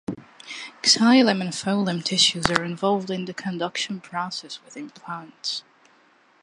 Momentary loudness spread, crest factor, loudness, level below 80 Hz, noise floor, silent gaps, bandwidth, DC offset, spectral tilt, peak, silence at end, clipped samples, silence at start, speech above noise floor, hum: 19 LU; 22 dB; -22 LUFS; -58 dBFS; -58 dBFS; none; 11.5 kHz; under 0.1%; -3.5 dB/octave; -2 dBFS; 0.85 s; under 0.1%; 0.1 s; 35 dB; none